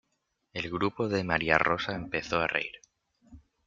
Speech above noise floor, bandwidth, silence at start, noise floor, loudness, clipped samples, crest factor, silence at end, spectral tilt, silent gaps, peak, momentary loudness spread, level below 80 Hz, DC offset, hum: 49 dB; 7.6 kHz; 0.55 s; -79 dBFS; -29 LUFS; under 0.1%; 28 dB; 0.25 s; -5.5 dB/octave; none; -4 dBFS; 11 LU; -58 dBFS; under 0.1%; none